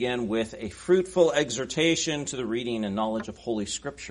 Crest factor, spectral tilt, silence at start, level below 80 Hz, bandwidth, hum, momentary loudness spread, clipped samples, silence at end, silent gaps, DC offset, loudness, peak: 20 dB; -4 dB/octave; 0 s; -56 dBFS; 10.5 kHz; none; 10 LU; under 0.1%; 0 s; none; under 0.1%; -27 LUFS; -8 dBFS